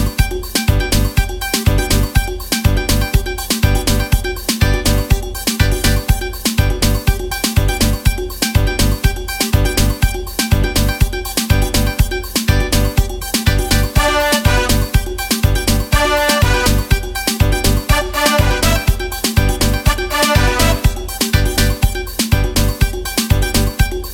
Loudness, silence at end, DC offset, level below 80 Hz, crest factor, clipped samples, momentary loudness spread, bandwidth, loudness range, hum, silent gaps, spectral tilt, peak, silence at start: -15 LUFS; 0 s; under 0.1%; -18 dBFS; 14 dB; under 0.1%; 5 LU; 17 kHz; 2 LU; none; none; -4 dB/octave; 0 dBFS; 0 s